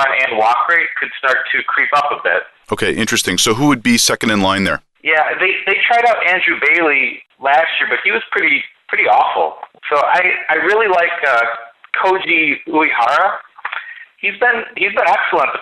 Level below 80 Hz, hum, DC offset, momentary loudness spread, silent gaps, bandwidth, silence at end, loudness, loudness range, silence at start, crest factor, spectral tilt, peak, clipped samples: -52 dBFS; none; under 0.1%; 8 LU; none; 12 kHz; 0 s; -14 LUFS; 2 LU; 0 s; 12 dB; -2.5 dB/octave; -2 dBFS; under 0.1%